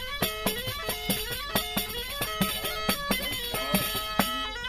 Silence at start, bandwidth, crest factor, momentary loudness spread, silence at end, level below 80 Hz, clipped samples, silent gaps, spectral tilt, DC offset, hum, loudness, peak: 0 s; 16 kHz; 24 dB; 4 LU; 0 s; -44 dBFS; under 0.1%; none; -3 dB/octave; under 0.1%; none; -28 LUFS; -8 dBFS